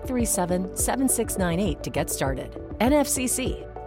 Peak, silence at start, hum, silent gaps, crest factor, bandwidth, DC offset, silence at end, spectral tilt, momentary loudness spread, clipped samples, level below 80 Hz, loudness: -10 dBFS; 0 s; none; none; 16 dB; 17 kHz; under 0.1%; 0 s; -4.5 dB/octave; 7 LU; under 0.1%; -38 dBFS; -24 LUFS